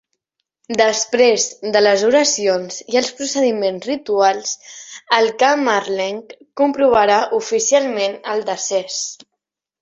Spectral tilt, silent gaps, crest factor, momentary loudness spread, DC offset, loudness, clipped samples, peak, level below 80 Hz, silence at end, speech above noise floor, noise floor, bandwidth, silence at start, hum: -2 dB/octave; none; 18 dB; 10 LU; under 0.1%; -17 LUFS; under 0.1%; 0 dBFS; -60 dBFS; 0.65 s; 62 dB; -79 dBFS; 8 kHz; 0.7 s; none